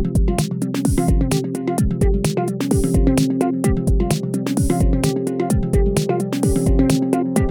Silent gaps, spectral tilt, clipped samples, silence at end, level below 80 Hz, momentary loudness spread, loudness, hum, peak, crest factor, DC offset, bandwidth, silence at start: none; -6.5 dB/octave; under 0.1%; 0 s; -24 dBFS; 4 LU; -19 LUFS; none; -2 dBFS; 16 dB; under 0.1%; 19 kHz; 0 s